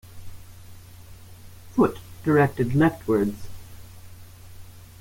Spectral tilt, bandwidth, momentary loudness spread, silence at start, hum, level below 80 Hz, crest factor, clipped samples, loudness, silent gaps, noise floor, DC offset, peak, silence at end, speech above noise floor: -8 dB/octave; 17 kHz; 25 LU; 0.1 s; none; -50 dBFS; 20 dB; under 0.1%; -23 LUFS; none; -44 dBFS; under 0.1%; -6 dBFS; 0.2 s; 23 dB